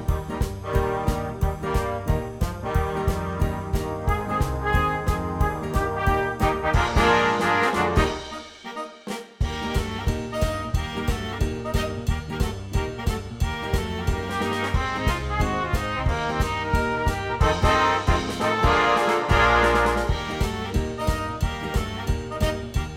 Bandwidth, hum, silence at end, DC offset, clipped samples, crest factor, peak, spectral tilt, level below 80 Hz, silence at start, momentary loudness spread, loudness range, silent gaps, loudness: 17 kHz; none; 0 s; under 0.1%; under 0.1%; 18 dB; -6 dBFS; -5.5 dB/octave; -30 dBFS; 0 s; 9 LU; 7 LU; none; -24 LUFS